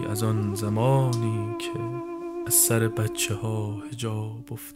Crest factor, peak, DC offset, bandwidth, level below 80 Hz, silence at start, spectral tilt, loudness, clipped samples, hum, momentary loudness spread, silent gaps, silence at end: 18 dB; -8 dBFS; under 0.1%; 16 kHz; -56 dBFS; 0 s; -4.5 dB/octave; -25 LUFS; under 0.1%; none; 13 LU; none; 0 s